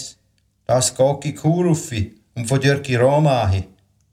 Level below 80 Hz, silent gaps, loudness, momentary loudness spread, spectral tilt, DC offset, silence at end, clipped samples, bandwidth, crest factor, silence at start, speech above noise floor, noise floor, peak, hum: -48 dBFS; none; -19 LUFS; 13 LU; -5.5 dB/octave; under 0.1%; 0.45 s; under 0.1%; 15 kHz; 14 dB; 0 s; 45 dB; -63 dBFS; -4 dBFS; none